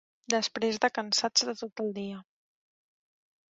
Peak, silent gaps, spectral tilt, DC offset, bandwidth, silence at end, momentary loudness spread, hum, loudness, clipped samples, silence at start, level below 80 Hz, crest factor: -8 dBFS; 1.72-1.76 s; -2 dB/octave; under 0.1%; 8 kHz; 1.3 s; 13 LU; none; -29 LUFS; under 0.1%; 0.3 s; -78 dBFS; 24 dB